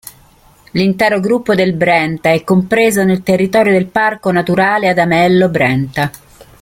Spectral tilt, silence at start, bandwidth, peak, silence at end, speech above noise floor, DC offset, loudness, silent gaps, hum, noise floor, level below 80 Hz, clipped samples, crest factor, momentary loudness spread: -6 dB/octave; 0.05 s; 16.5 kHz; 0 dBFS; 0.2 s; 34 dB; under 0.1%; -12 LUFS; none; none; -46 dBFS; -48 dBFS; under 0.1%; 12 dB; 5 LU